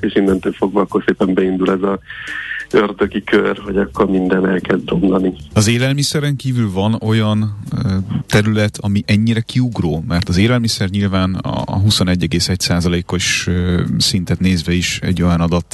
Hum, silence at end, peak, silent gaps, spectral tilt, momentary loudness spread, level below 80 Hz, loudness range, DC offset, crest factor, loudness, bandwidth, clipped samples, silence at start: none; 0.1 s; -2 dBFS; none; -5.5 dB/octave; 5 LU; -36 dBFS; 1 LU; under 0.1%; 14 dB; -16 LUFS; 12.5 kHz; under 0.1%; 0 s